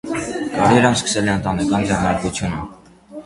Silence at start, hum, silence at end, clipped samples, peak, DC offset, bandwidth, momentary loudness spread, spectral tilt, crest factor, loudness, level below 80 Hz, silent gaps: 0.05 s; none; 0 s; under 0.1%; 0 dBFS; under 0.1%; 11.5 kHz; 13 LU; -5 dB/octave; 18 dB; -18 LUFS; -40 dBFS; none